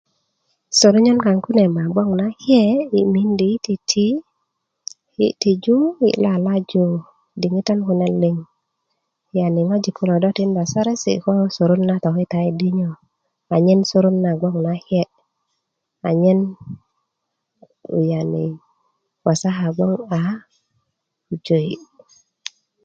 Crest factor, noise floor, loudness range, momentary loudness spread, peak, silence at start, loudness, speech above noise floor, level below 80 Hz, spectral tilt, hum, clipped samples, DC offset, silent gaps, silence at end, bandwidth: 18 dB; -77 dBFS; 6 LU; 13 LU; -2 dBFS; 0.7 s; -18 LUFS; 60 dB; -60 dBFS; -6 dB/octave; none; under 0.1%; under 0.1%; none; 1.05 s; 7.8 kHz